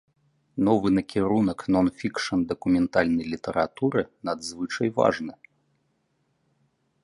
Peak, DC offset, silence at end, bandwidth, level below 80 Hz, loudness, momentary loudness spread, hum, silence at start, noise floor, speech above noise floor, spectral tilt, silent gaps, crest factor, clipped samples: -6 dBFS; under 0.1%; 1.75 s; 11.5 kHz; -54 dBFS; -25 LUFS; 9 LU; none; 0.55 s; -72 dBFS; 47 dB; -6 dB/octave; none; 20 dB; under 0.1%